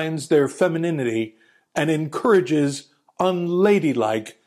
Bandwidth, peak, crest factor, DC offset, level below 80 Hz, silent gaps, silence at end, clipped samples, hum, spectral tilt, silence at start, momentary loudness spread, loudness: 15 kHz; -6 dBFS; 14 dB; under 0.1%; -68 dBFS; none; 0.15 s; under 0.1%; none; -6 dB/octave; 0 s; 8 LU; -21 LUFS